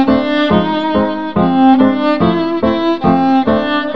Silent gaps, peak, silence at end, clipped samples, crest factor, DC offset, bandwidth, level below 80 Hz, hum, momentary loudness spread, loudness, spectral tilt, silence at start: none; 0 dBFS; 0 s; under 0.1%; 12 dB; 2%; 6 kHz; -40 dBFS; none; 5 LU; -13 LUFS; -8 dB/octave; 0 s